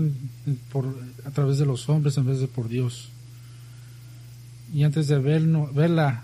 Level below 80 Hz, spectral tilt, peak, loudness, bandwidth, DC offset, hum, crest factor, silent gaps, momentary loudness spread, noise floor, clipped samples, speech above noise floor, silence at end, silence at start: -58 dBFS; -7.5 dB/octave; -10 dBFS; -24 LUFS; 12.5 kHz; under 0.1%; 60 Hz at -40 dBFS; 14 dB; none; 23 LU; -43 dBFS; under 0.1%; 20 dB; 0 s; 0 s